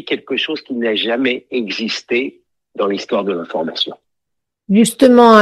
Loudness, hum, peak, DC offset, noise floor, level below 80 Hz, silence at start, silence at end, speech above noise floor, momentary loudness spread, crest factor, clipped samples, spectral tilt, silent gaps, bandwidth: -16 LUFS; none; 0 dBFS; under 0.1%; -79 dBFS; -60 dBFS; 0.05 s; 0 s; 64 dB; 11 LU; 16 dB; under 0.1%; -4.5 dB/octave; none; 12.5 kHz